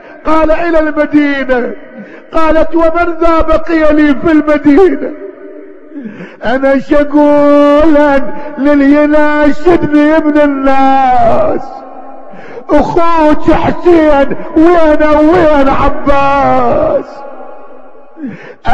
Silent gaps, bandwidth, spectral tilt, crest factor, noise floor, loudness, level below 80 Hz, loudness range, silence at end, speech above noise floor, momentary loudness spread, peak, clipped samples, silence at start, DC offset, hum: none; 7.6 kHz; -7 dB/octave; 8 dB; -35 dBFS; -8 LUFS; -26 dBFS; 3 LU; 0 s; 28 dB; 19 LU; 0 dBFS; 4%; 0.05 s; under 0.1%; none